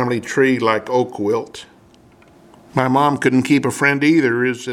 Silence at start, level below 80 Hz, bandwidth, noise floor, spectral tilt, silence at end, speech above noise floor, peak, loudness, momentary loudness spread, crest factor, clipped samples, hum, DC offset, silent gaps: 0 s; -60 dBFS; 15 kHz; -48 dBFS; -5.5 dB/octave; 0 s; 32 dB; 0 dBFS; -17 LUFS; 8 LU; 18 dB; under 0.1%; none; under 0.1%; none